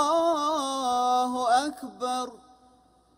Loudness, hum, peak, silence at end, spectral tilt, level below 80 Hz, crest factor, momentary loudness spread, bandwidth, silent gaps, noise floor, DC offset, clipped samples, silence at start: -26 LUFS; none; -12 dBFS; 0.8 s; -2 dB/octave; -68 dBFS; 16 dB; 10 LU; 16 kHz; none; -60 dBFS; under 0.1%; under 0.1%; 0 s